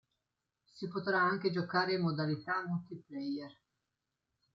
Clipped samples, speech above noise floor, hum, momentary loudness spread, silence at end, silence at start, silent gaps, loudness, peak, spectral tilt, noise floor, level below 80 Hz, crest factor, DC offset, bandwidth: under 0.1%; 53 dB; none; 12 LU; 1.05 s; 0.75 s; none; -35 LUFS; -18 dBFS; -7.5 dB/octave; -88 dBFS; -80 dBFS; 20 dB; under 0.1%; 7.4 kHz